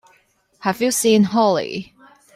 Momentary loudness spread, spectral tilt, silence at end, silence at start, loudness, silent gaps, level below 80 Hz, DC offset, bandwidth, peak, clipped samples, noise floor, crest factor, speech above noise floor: 12 LU; -4.5 dB/octave; 0.5 s; 0.6 s; -18 LUFS; none; -60 dBFS; under 0.1%; 15 kHz; -4 dBFS; under 0.1%; -59 dBFS; 16 dB; 42 dB